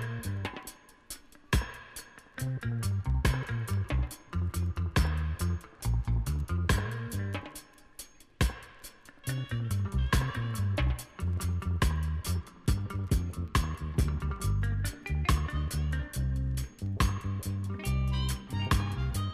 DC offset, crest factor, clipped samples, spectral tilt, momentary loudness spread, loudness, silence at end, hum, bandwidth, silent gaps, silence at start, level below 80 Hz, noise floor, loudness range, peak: under 0.1%; 18 dB; under 0.1%; -5.5 dB/octave; 15 LU; -32 LUFS; 0 s; none; 15.5 kHz; none; 0 s; -36 dBFS; -51 dBFS; 3 LU; -12 dBFS